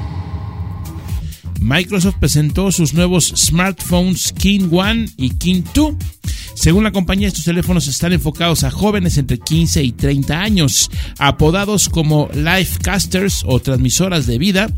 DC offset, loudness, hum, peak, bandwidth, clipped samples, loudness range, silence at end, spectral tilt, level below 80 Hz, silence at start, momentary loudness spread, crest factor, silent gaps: 0.1%; -15 LUFS; none; 0 dBFS; 16.5 kHz; under 0.1%; 2 LU; 0 s; -4.5 dB/octave; -26 dBFS; 0 s; 12 LU; 14 dB; none